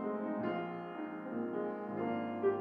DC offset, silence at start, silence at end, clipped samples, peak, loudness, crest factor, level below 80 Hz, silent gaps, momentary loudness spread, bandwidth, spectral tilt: under 0.1%; 0 s; 0 s; under 0.1%; -22 dBFS; -39 LUFS; 16 dB; -82 dBFS; none; 7 LU; 5 kHz; -9.5 dB/octave